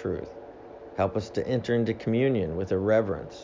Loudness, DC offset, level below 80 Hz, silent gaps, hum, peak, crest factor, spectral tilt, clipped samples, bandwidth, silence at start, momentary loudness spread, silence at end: -27 LUFS; under 0.1%; -50 dBFS; none; none; -10 dBFS; 16 dB; -8 dB/octave; under 0.1%; 7.6 kHz; 0 s; 18 LU; 0 s